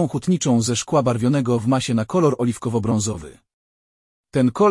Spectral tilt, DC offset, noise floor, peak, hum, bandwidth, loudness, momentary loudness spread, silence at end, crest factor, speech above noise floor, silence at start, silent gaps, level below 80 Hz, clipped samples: -6 dB/octave; under 0.1%; under -90 dBFS; -6 dBFS; none; 12 kHz; -20 LUFS; 5 LU; 0 s; 14 dB; over 71 dB; 0 s; 3.53-4.23 s; -52 dBFS; under 0.1%